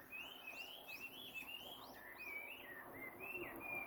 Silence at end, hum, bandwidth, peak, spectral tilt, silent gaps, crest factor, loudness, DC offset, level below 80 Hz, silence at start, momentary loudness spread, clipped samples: 0 s; none; over 20 kHz; -36 dBFS; -2.5 dB/octave; none; 16 dB; -50 LUFS; under 0.1%; -78 dBFS; 0 s; 5 LU; under 0.1%